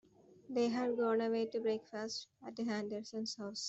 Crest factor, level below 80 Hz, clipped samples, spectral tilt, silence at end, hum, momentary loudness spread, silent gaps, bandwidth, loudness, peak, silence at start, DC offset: 16 dB; -82 dBFS; under 0.1%; -4 dB/octave; 0 s; none; 9 LU; none; 8.2 kHz; -38 LUFS; -24 dBFS; 0.5 s; under 0.1%